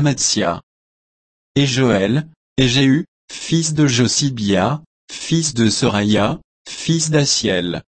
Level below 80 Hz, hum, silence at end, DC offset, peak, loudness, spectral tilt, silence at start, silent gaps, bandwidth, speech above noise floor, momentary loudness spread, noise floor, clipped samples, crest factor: -46 dBFS; none; 0.15 s; under 0.1%; -2 dBFS; -17 LUFS; -4.5 dB/octave; 0 s; 0.63-1.55 s, 2.36-2.56 s, 3.08-3.28 s, 4.86-5.08 s, 6.44-6.65 s; 8.8 kHz; over 74 dB; 13 LU; under -90 dBFS; under 0.1%; 16 dB